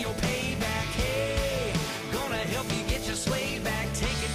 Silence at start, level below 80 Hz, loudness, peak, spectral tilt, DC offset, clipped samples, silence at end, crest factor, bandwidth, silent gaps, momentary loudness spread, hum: 0 s; -38 dBFS; -29 LUFS; -16 dBFS; -4 dB/octave; under 0.1%; under 0.1%; 0 s; 12 dB; 15.5 kHz; none; 2 LU; none